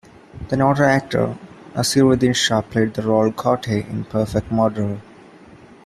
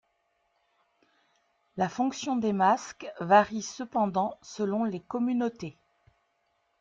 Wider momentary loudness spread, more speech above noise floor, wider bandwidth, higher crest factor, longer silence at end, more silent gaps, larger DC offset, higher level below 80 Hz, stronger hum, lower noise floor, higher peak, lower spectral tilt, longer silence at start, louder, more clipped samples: second, 11 LU vs 15 LU; second, 26 dB vs 47 dB; first, 14 kHz vs 7.8 kHz; second, 16 dB vs 22 dB; second, 0.85 s vs 1.1 s; neither; neither; first, -46 dBFS vs -70 dBFS; neither; second, -44 dBFS vs -74 dBFS; first, -2 dBFS vs -8 dBFS; about the same, -5 dB/octave vs -5.5 dB/octave; second, 0.35 s vs 1.75 s; first, -19 LUFS vs -28 LUFS; neither